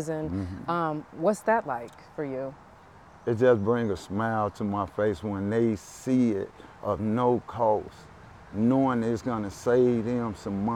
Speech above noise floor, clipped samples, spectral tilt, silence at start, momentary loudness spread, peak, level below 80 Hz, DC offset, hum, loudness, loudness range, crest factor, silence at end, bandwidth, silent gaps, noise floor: 25 dB; under 0.1%; -7.5 dB/octave; 0 s; 12 LU; -10 dBFS; -56 dBFS; under 0.1%; none; -27 LUFS; 2 LU; 18 dB; 0 s; 13.5 kHz; none; -51 dBFS